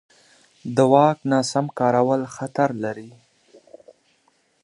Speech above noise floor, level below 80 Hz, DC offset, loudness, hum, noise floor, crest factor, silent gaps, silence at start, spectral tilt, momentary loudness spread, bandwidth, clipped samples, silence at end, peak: 44 dB; -70 dBFS; under 0.1%; -20 LUFS; none; -64 dBFS; 20 dB; none; 0.65 s; -6 dB/octave; 13 LU; 11.5 kHz; under 0.1%; 1.55 s; -2 dBFS